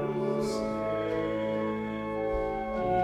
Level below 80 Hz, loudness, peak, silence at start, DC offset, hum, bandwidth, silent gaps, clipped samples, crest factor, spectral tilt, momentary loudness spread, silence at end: -48 dBFS; -31 LUFS; -16 dBFS; 0 s; under 0.1%; none; 14 kHz; none; under 0.1%; 14 dB; -6.5 dB/octave; 3 LU; 0 s